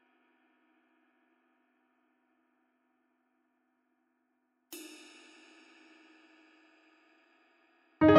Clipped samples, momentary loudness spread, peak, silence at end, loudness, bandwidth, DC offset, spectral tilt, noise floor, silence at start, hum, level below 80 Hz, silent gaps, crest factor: under 0.1%; 14 LU; -8 dBFS; 0 s; -35 LUFS; 11.5 kHz; under 0.1%; -6.5 dB/octave; -78 dBFS; 4.7 s; none; -66 dBFS; none; 28 dB